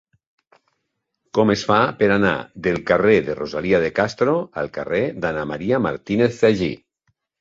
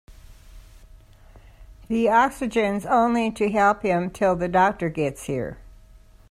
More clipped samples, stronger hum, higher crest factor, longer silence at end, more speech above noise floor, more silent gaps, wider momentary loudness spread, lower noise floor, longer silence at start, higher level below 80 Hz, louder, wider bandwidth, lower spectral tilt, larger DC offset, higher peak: neither; neither; about the same, 20 dB vs 18 dB; about the same, 0.65 s vs 0.6 s; first, 57 dB vs 28 dB; neither; about the same, 8 LU vs 9 LU; first, -76 dBFS vs -50 dBFS; first, 1.35 s vs 0.1 s; about the same, -50 dBFS vs -48 dBFS; about the same, -20 LUFS vs -22 LUFS; second, 7.8 kHz vs 14.5 kHz; about the same, -6.5 dB/octave vs -6 dB/octave; neither; first, -2 dBFS vs -6 dBFS